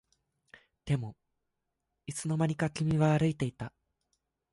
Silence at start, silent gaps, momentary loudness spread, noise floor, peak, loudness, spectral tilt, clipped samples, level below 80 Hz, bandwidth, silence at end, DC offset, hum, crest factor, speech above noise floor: 0.85 s; none; 18 LU; -84 dBFS; -14 dBFS; -31 LUFS; -6.5 dB/octave; under 0.1%; -60 dBFS; 11.5 kHz; 0.85 s; under 0.1%; none; 18 dB; 54 dB